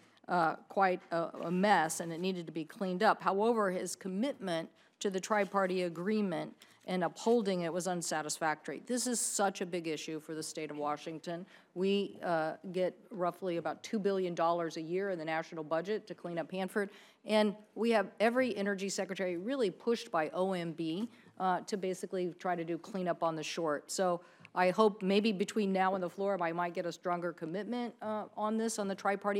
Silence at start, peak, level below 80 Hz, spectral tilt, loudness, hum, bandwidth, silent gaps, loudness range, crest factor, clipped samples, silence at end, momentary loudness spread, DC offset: 0.3 s; -14 dBFS; -90 dBFS; -4.5 dB/octave; -34 LUFS; none; 17 kHz; none; 4 LU; 20 dB; under 0.1%; 0 s; 9 LU; under 0.1%